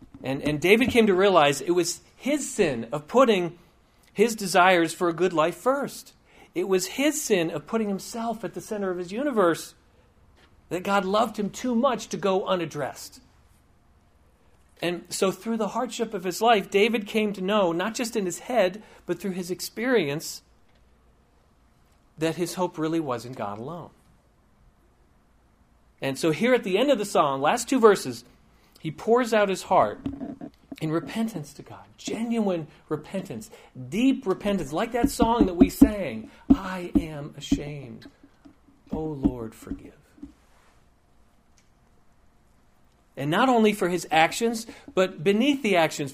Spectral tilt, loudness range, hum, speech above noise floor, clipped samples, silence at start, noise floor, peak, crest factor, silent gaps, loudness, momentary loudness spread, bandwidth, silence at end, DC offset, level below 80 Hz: -4.5 dB/octave; 9 LU; none; 36 dB; under 0.1%; 0 s; -61 dBFS; 0 dBFS; 24 dB; none; -25 LUFS; 17 LU; 15.5 kHz; 0 s; under 0.1%; -48 dBFS